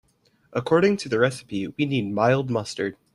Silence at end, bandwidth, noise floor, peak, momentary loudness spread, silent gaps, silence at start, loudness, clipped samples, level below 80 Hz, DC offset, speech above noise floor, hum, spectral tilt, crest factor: 0.2 s; 12 kHz; -61 dBFS; -6 dBFS; 11 LU; none; 0.5 s; -24 LUFS; under 0.1%; -62 dBFS; under 0.1%; 38 dB; none; -6 dB/octave; 18 dB